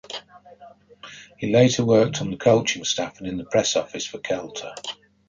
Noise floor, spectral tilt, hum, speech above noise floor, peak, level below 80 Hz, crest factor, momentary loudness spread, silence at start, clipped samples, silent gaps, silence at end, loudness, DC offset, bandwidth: -47 dBFS; -4.5 dB/octave; none; 25 dB; -4 dBFS; -56 dBFS; 18 dB; 18 LU; 0.1 s; under 0.1%; none; 0.35 s; -22 LUFS; under 0.1%; 9.4 kHz